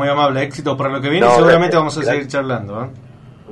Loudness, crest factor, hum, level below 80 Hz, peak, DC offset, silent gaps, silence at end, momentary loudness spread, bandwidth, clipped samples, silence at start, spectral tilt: -15 LUFS; 14 dB; none; -48 dBFS; -2 dBFS; under 0.1%; none; 0 s; 13 LU; 11 kHz; under 0.1%; 0 s; -6 dB/octave